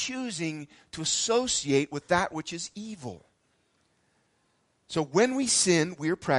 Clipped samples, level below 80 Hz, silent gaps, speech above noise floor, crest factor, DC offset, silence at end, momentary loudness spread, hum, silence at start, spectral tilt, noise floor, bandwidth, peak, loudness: under 0.1%; -62 dBFS; none; 43 dB; 20 dB; under 0.1%; 0 s; 16 LU; none; 0 s; -3 dB/octave; -71 dBFS; 11.5 kHz; -10 dBFS; -27 LUFS